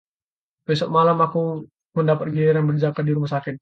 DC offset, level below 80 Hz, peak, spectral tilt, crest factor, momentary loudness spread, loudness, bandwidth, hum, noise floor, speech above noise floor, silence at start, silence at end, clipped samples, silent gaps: under 0.1%; -62 dBFS; -6 dBFS; -8.5 dB/octave; 16 dB; 10 LU; -21 LUFS; 7.6 kHz; none; under -90 dBFS; over 70 dB; 0.7 s; 0.05 s; under 0.1%; 1.85-1.90 s